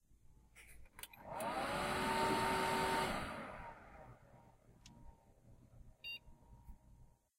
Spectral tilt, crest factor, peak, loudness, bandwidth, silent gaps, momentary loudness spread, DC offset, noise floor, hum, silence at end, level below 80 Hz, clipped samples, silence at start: -4 dB/octave; 20 dB; -24 dBFS; -40 LUFS; 16 kHz; none; 26 LU; under 0.1%; -65 dBFS; none; 0.35 s; -60 dBFS; under 0.1%; 0.1 s